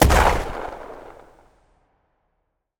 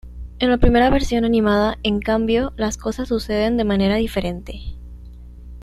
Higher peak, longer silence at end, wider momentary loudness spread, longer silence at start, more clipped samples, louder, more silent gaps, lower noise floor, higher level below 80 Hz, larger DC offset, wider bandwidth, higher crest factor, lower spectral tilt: about the same, 0 dBFS vs -2 dBFS; first, 1.7 s vs 0 s; first, 25 LU vs 18 LU; about the same, 0 s vs 0.05 s; neither; about the same, -21 LUFS vs -19 LUFS; neither; first, -74 dBFS vs -38 dBFS; about the same, -28 dBFS vs -28 dBFS; neither; first, over 20 kHz vs 13 kHz; about the same, 22 dB vs 18 dB; second, -4.5 dB/octave vs -6 dB/octave